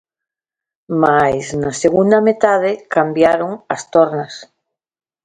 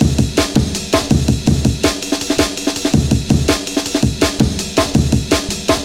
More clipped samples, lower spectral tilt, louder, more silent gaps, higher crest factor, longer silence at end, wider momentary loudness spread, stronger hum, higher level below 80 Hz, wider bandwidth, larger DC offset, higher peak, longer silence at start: neither; about the same, -5.5 dB/octave vs -5 dB/octave; about the same, -15 LUFS vs -16 LUFS; neither; about the same, 16 dB vs 16 dB; first, 0.8 s vs 0 s; first, 11 LU vs 3 LU; neither; second, -52 dBFS vs -26 dBFS; second, 9.6 kHz vs 17 kHz; neither; about the same, 0 dBFS vs 0 dBFS; first, 0.9 s vs 0 s